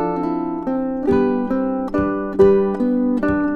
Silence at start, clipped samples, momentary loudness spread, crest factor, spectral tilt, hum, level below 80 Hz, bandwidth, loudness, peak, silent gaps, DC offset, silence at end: 0 s; under 0.1%; 8 LU; 16 dB; -9.5 dB/octave; none; -42 dBFS; 5.2 kHz; -19 LUFS; -2 dBFS; none; under 0.1%; 0 s